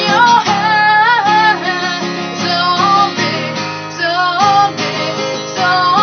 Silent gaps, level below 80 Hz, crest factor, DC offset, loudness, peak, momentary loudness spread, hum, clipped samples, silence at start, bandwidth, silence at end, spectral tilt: none; -62 dBFS; 12 dB; under 0.1%; -12 LUFS; 0 dBFS; 9 LU; none; under 0.1%; 0 s; 6.6 kHz; 0 s; -3.5 dB/octave